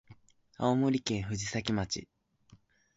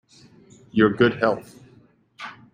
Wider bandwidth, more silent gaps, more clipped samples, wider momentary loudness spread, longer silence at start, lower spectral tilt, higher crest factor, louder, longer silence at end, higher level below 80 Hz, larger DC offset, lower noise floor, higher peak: second, 8 kHz vs 14.5 kHz; neither; neither; second, 7 LU vs 21 LU; second, 0.1 s vs 0.75 s; second, -5 dB/octave vs -7 dB/octave; about the same, 20 dB vs 22 dB; second, -32 LUFS vs -21 LUFS; first, 0.4 s vs 0.25 s; about the same, -56 dBFS vs -58 dBFS; neither; first, -63 dBFS vs -55 dBFS; second, -14 dBFS vs -4 dBFS